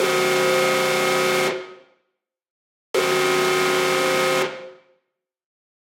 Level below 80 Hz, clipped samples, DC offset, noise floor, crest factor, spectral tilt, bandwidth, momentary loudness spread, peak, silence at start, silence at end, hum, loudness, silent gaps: -74 dBFS; under 0.1%; under 0.1%; -77 dBFS; 14 dB; -3 dB/octave; 17 kHz; 7 LU; -8 dBFS; 0 s; 1.15 s; none; -19 LUFS; 2.50-2.94 s